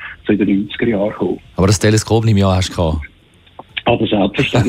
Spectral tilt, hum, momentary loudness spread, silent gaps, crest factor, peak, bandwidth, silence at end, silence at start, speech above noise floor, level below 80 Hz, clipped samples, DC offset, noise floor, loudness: -5.5 dB/octave; none; 8 LU; none; 14 dB; -2 dBFS; 15 kHz; 0 s; 0 s; 27 dB; -34 dBFS; under 0.1%; under 0.1%; -41 dBFS; -15 LUFS